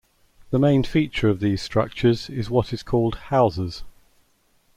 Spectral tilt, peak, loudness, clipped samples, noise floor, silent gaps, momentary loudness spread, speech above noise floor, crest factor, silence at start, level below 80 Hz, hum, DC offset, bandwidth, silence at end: -7.5 dB/octave; -6 dBFS; -22 LUFS; under 0.1%; -62 dBFS; none; 7 LU; 41 dB; 16 dB; 0.5 s; -44 dBFS; none; under 0.1%; 13 kHz; 0.85 s